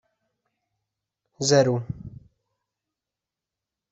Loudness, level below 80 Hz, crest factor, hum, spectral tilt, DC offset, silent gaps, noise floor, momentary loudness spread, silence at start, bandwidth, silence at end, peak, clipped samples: -22 LUFS; -58 dBFS; 24 dB; none; -5 dB/octave; under 0.1%; none; -88 dBFS; 19 LU; 1.4 s; 8 kHz; 1.8 s; -6 dBFS; under 0.1%